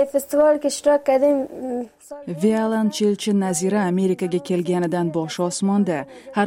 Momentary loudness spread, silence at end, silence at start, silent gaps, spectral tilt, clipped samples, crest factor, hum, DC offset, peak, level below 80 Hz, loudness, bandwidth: 10 LU; 0 s; 0 s; none; -5.5 dB/octave; under 0.1%; 14 dB; none; under 0.1%; -6 dBFS; -62 dBFS; -21 LUFS; 16 kHz